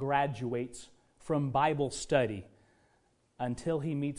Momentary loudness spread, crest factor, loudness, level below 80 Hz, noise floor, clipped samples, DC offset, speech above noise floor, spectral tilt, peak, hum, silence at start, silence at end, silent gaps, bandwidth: 14 LU; 20 dB; -32 LUFS; -60 dBFS; -71 dBFS; under 0.1%; under 0.1%; 39 dB; -6 dB/octave; -12 dBFS; none; 0 s; 0 s; none; 11 kHz